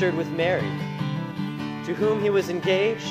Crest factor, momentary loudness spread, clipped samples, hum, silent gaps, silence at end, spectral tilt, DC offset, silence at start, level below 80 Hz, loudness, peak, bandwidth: 14 dB; 8 LU; under 0.1%; none; none; 0 s; -6.5 dB/octave; under 0.1%; 0 s; -64 dBFS; -25 LUFS; -10 dBFS; 15.5 kHz